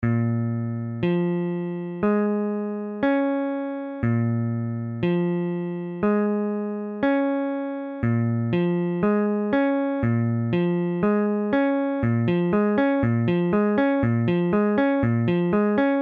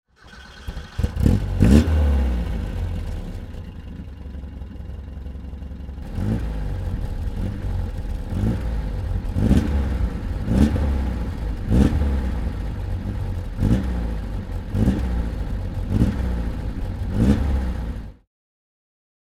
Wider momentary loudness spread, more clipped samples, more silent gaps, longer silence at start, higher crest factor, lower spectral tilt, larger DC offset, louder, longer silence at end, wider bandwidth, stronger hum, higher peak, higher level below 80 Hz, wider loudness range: second, 7 LU vs 16 LU; neither; neither; second, 0 s vs 0.25 s; second, 14 dB vs 22 dB; first, -10.5 dB/octave vs -8 dB/octave; neither; about the same, -23 LUFS vs -24 LUFS; second, 0 s vs 1.25 s; second, 4.7 kHz vs 13 kHz; neither; second, -8 dBFS vs 0 dBFS; second, -52 dBFS vs -26 dBFS; second, 4 LU vs 9 LU